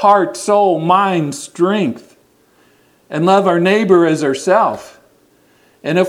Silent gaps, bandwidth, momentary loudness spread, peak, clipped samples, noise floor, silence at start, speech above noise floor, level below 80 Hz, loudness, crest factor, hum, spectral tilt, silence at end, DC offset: none; 14 kHz; 11 LU; 0 dBFS; under 0.1%; -53 dBFS; 0 s; 40 dB; -64 dBFS; -14 LUFS; 14 dB; none; -5.5 dB/octave; 0 s; under 0.1%